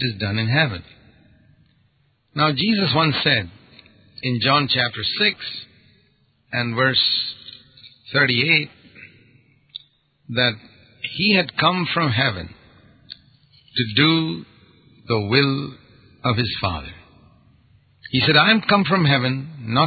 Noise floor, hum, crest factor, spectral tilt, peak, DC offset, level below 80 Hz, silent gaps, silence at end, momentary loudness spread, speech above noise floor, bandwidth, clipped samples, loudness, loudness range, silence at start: -63 dBFS; none; 20 dB; -10 dB/octave; -2 dBFS; under 0.1%; -50 dBFS; none; 0 s; 19 LU; 43 dB; 4.9 kHz; under 0.1%; -19 LUFS; 3 LU; 0 s